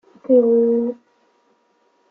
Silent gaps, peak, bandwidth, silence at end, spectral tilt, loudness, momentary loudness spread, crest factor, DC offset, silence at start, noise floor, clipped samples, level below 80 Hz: none; -4 dBFS; 2.3 kHz; 1.15 s; -11 dB/octave; -17 LUFS; 14 LU; 16 dB; under 0.1%; 0.3 s; -62 dBFS; under 0.1%; -70 dBFS